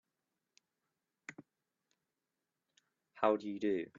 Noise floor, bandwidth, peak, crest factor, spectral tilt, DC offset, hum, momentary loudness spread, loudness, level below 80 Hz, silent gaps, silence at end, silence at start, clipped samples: -89 dBFS; 7.2 kHz; -16 dBFS; 26 dB; -4.5 dB/octave; under 0.1%; none; 20 LU; -35 LUFS; -88 dBFS; none; 0.15 s; 1.3 s; under 0.1%